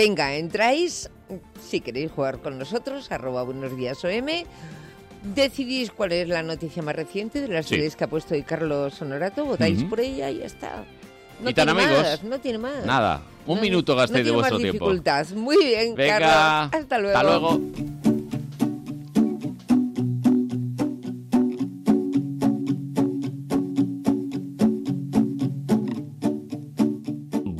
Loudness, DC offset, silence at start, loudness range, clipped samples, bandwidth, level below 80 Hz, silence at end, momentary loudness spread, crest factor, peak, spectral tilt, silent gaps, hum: -24 LUFS; under 0.1%; 0 s; 7 LU; under 0.1%; 15.5 kHz; -52 dBFS; 0 s; 12 LU; 14 dB; -10 dBFS; -5.5 dB/octave; none; none